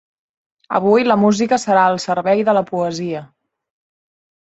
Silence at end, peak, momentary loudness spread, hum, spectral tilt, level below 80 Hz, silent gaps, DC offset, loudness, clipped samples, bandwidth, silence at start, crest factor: 1.25 s; -2 dBFS; 9 LU; none; -5.5 dB/octave; -62 dBFS; none; under 0.1%; -16 LUFS; under 0.1%; 8.2 kHz; 0.7 s; 16 dB